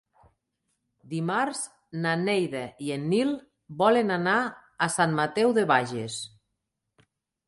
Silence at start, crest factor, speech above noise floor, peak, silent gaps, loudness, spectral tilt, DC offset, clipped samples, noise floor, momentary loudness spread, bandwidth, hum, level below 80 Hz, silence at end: 1.05 s; 20 dB; 56 dB; -8 dBFS; none; -26 LUFS; -5 dB/octave; under 0.1%; under 0.1%; -82 dBFS; 13 LU; 11.5 kHz; none; -70 dBFS; 1.2 s